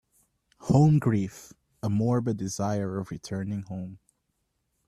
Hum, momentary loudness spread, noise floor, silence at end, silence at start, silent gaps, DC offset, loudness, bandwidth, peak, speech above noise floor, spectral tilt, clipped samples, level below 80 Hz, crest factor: none; 17 LU; -77 dBFS; 0.9 s; 0.6 s; none; under 0.1%; -27 LUFS; 13 kHz; -8 dBFS; 51 dB; -7.5 dB/octave; under 0.1%; -58 dBFS; 20 dB